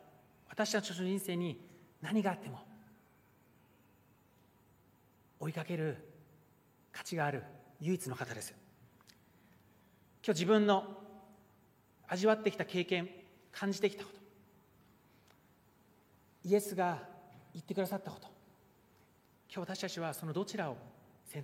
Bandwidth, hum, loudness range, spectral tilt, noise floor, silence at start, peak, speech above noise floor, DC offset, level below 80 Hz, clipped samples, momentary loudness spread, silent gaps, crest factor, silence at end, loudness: 16 kHz; none; 11 LU; -5 dB/octave; -68 dBFS; 0.5 s; -16 dBFS; 32 dB; under 0.1%; -82 dBFS; under 0.1%; 21 LU; none; 24 dB; 0 s; -37 LUFS